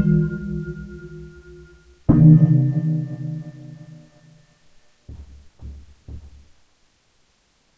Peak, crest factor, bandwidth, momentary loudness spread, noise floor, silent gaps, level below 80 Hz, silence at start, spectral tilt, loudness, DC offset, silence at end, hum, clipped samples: -2 dBFS; 20 dB; 2.2 kHz; 30 LU; -62 dBFS; none; -40 dBFS; 0 s; -11.5 dB/octave; -18 LUFS; under 0.1%; 1.6 s; none; under 0.1%